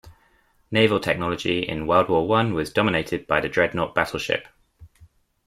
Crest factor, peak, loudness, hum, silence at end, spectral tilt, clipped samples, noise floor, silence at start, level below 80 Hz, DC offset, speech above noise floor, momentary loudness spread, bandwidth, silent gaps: 22 dB; -2 dBFS; -22 LUFS; none; 0.4 s; -5.5 dB/octave; under 0.1%; -61 dBFS; 0.05 s; -50 dBFS; under 0.1%; 39 dB; 6 LU; 15.5 kHz; none